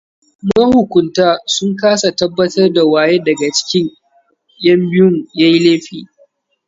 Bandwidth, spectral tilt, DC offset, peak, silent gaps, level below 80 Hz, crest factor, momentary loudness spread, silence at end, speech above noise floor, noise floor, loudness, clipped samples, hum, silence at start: 7.8 kHz; -5 dB/octave; under 0.1%; 0 dBFS; none; -50 dBFS; 12 dB; 6 LU; 0.65 s; 44 dB; -56 dBFS; -12 LUFS; under 0.1%; none; 0.45 s